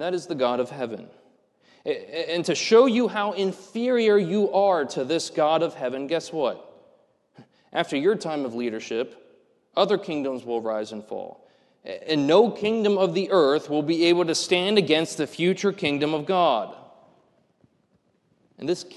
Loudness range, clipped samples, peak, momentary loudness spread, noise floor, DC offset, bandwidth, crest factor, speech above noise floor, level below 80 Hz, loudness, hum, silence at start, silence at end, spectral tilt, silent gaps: 7 LU; under 0.1%; -4 dBFS; 13 LU; -67 dBFS; under 0.1%; 12 kHz; 20 dB; 44 dB; -72 dBFS; -23 LUFS; none; 0 s; 0 s; -4.5 dB/octave; none